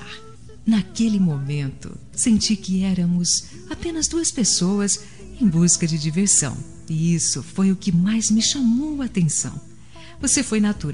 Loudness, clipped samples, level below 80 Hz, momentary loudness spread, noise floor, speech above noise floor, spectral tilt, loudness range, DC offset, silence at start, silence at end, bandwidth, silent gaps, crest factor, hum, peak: -20 LUFS; under 0.1%; -46 dBFS; 11 LU; -44 dBFS; 23 dB; -4 dB/octave; 2 LU; 0.8%; 0 s; 0 s; 11.5 kHz; none; 16 dB; none; -4 dBFS